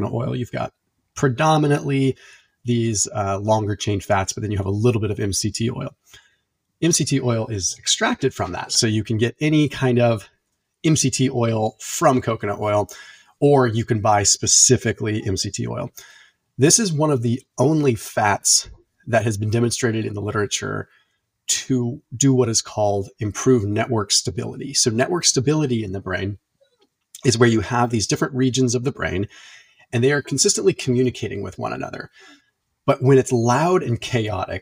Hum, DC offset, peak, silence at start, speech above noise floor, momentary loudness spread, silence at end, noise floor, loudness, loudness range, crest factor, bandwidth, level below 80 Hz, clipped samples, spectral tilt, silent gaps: none; under 0.1%; -2 dBFS; 0 s; 51 dB; 12 LU; 0 s; -70 dBFS; -20 LUFS; 4 LU; 20 dB; 16 kHz; -52 dBFS; under 0.1%; -4 dB/octave; none